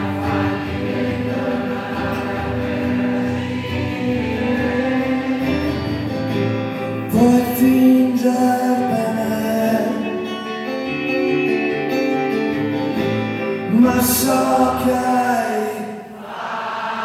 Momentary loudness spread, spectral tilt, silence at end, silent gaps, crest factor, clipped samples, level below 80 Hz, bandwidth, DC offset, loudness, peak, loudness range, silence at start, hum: 9 LU; -5.5 dB/octave; 0 s; none; 16 dB; under 0.1%; -44 dBFS; 16 kHz; under 0.1%; -19 LUFS; -4 dBFS; 5 LU; 0 s; none